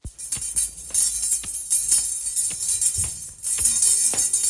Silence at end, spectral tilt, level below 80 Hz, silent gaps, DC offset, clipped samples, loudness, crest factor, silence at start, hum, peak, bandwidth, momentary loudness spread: 0 s; 0.5 dB/octave; -48 dBFS; none; under 0.1%; under 0.1%; -20 LUFS; 20 dB; 0.05 s; none; -4 dBFS; 11.5 kHz; 9 LU